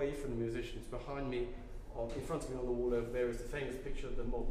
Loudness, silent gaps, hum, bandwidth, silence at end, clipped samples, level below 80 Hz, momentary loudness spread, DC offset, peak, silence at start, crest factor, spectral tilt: -40 LUFS; none; none; 14.5 kHz; 0 s; under 0.1%; -44 dBFS; 9 LU; under 0.1%; -24 dBFS; 0 s; 14 dB; -6.5 dB/octave